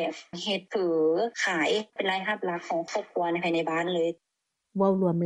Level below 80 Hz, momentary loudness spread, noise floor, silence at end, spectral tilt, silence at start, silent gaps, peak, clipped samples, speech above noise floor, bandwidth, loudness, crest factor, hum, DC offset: -76 dBFS; 7 LU; -55 dBFS; 0 s; -5 dB/octave; 0 s; none; -12 dBFS; under 0.1%; 28 dB; 10.5 kHz; -28 LUFS; 16 dB; none; under 0.1%